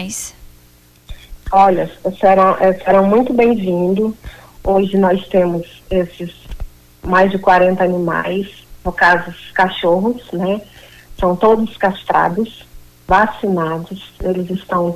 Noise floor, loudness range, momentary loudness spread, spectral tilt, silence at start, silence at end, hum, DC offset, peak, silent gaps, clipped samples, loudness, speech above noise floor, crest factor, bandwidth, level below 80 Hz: -47 dBFS; 4 LU; 14 LU; -6 dB/octave; 0 s; 0 s; 60 Hz at -40 dBFS; under 0.1%; -2 dBFS; none; under 0.1%; -15 LUFS; 33 dB; 14 dB; 15 kHz; -38 dBFS